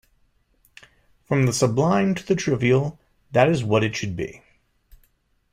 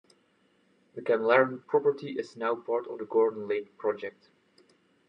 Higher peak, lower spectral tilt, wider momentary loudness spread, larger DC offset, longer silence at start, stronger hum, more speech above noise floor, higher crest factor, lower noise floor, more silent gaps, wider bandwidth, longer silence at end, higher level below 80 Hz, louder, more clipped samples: first, -4 dBFS vs -10 dBFS; about the same, -6 dB/octave vs -6.5 dB/octave; second, 10 LU vs 13 LU; neither; first, 1.3 s vs 0.95 s; neither; first, 44 dB vs 40 dB; about the same, 20 dB vs 20 dB; about the same, -65 dBFS vs -68 dBFS; neither; first, 15.5 kHz vs 7.4 kHz; first, 1.15 s vs 1 s; first, -54 dBFS vs -88 dBFS; first, -22 LUFS vs -29 LUFS; neither